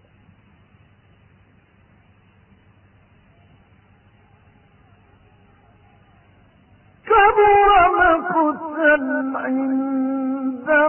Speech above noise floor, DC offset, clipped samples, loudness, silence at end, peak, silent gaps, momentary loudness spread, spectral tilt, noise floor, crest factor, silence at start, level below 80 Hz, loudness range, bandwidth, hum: 38 dB; under 0.1%; under 0.1%; -17 LUFS; 0 s; -4 dBFS; none; 10 LU; -9.5 dB/octave; -54 dBFS; 18 dB; 7.05 s; -48 dBFS; 5 LU; 3.2 kHz; none